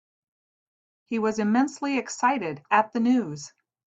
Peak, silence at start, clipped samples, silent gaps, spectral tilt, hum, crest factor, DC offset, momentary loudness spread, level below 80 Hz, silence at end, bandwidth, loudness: -8 dBFS; 1.1 s; under 0.1%; none; -5 dB/octave; none; 18 dB; under 0.1%; 10 LU; -72 dBFS; 0.45 s; 8.2 kHz; -25 LUFS